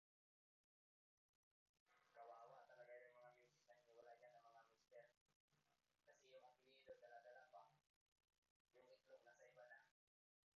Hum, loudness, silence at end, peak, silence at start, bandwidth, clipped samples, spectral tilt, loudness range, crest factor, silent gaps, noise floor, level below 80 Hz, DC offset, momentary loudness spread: none; -67 LUFS; 0.65 s; -52 dBFS; 1.75 s; 7 kHz; under 0.1%; -1 dB/octave; 1 LU; 18 dB; 1.80-1.86 s, 5.21-5.26 s, 5.36-5.48 s, 7.90-8.12 s, 8.38-8.42 s, 8.50-8.65 s; under -90 dBFS; under -90 dBFS; under 0.1%; 4 LU